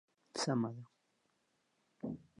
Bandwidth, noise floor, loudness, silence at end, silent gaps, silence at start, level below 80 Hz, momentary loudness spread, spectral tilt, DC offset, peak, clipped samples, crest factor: 11 kHz; -80 dBFS; -40 LUFS; 0.2 s; none; 0.35 s; -78 dBFS; 12 LU; -5 dB/octave; under 0.1%; -24 dBFS; under 0.1%; 18 dB